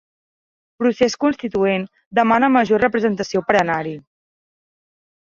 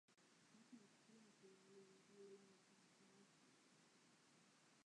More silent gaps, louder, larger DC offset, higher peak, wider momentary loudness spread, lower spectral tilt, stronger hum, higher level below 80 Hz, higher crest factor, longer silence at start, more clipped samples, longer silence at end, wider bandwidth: first, 2.06-2.11 s vs none; first, -18 LUFS vs -68 LUFS; neither; first, -2 dBFS vs -54 dBFS; first, 8 LU vs 4 LU; first, -5.5 dB/octave vs -3.5 dB/octave; neither; first, -56 dBFS vs under -90 dBFS; about the same, 18 dB vs 18 dB; first, 0.8 s vs 0.1 s; neither; first, 1.25 s vs 0 s; second, 7.6 kHz vs 10.5 kHz